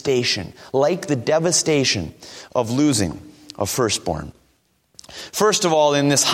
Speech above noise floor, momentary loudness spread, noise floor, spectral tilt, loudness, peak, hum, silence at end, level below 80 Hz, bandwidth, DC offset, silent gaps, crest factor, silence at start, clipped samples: 43 dB; 18 LU; -63 dBFS; -3.5 dB/octave; -19 LUFS; -2 dBFS; none; 0 s; -50 dBFS; 16.5 kHz; under 0.1%; none; 18 dB; 0.05 s; under 0.1%